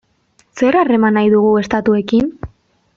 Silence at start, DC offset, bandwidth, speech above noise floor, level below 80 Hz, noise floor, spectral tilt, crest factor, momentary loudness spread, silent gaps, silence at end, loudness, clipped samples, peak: 0.55 s; under 0.1%; 7.2 kHz; 45 dB; -46 dBFS; -57 dBFS; -7 dB/octave; 12 dB; 10 LU; none; 0.5 s; -14 LUFS; under 0.1%; -2 dBFS